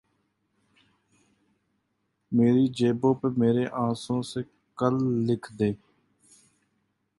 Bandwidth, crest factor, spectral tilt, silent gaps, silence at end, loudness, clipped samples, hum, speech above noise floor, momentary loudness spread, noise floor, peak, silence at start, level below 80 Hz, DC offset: 11.5 kHz; 20 dB; -7.5 dB/octave; none; 1.45 s; -26 LUFS; under 0.1%; none; 52 dB; 9 LU; -76 dBFS; -8 dBFS; 2.3 s; -64 dBFS; under 0.1%